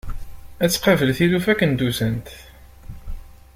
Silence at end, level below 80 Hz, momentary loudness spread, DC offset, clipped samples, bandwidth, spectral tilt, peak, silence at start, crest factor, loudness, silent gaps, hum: 0.2 s; -36 dBFS; 23 LU; under 0.1%; under 0.1%; 16.5 kHz; -5 dB/octave; -2 dBFS; 0.05 s; 18 dB; -19 LUFS; none; none